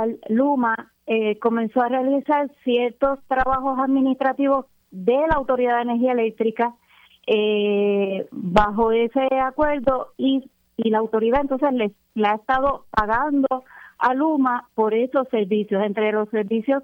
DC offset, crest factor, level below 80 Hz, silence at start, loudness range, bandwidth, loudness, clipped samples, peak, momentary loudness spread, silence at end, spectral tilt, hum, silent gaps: under 0.1%; 18 dB; -44 dBFS; 0 s; 1 LU; 6 kHz; -21 LUFS; under 0.1%; -2 dBFS; 5 LU; 0 s; -7.5 dB/octave; none; none